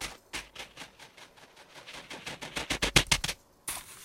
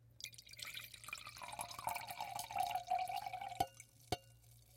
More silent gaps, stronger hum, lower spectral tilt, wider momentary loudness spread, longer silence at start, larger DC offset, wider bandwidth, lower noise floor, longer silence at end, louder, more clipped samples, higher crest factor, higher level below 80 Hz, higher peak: neither; neither; about the same, -2 dB/octave vs -2.5 dB/octave; first, 26 LU vs 11 LU; about the same, 0 s vs 0 s; neither; about the same, 16.5 kHz vs 16.5 kHz; second, -55 dBFS vs -65 dBFS; about the same, 0 s vs 0 s; first, -31 LUFS vs -45 LUFS; neither; first, 32 dB vs 24 dB; first, -48 dBFS vs -70 dBFS; first, -2 dBFS vs -22 dBFS